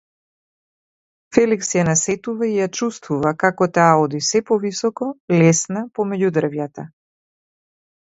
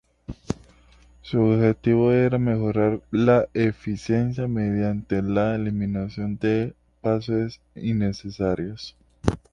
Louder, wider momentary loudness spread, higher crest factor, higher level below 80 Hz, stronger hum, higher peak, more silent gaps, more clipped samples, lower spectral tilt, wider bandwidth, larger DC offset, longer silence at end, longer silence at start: first, -18 LUFS vs -24 LUFS; second, 10 LU vs 13 LU; about the same, 20 dB vs 22 dB; second, -58 dBFS vs -46 dBFS; neither; about the same, 0 dBFS vs -2 dBFS; first, 5.20-5.28 s vs none; neither; second, -5 dB/octave vs -8.5 dB/octave; second, 8 kHz vs 9.4 kHz; neither; first, 1.15 s vs 0.15 s; first, 1.3 s vs 0.3 s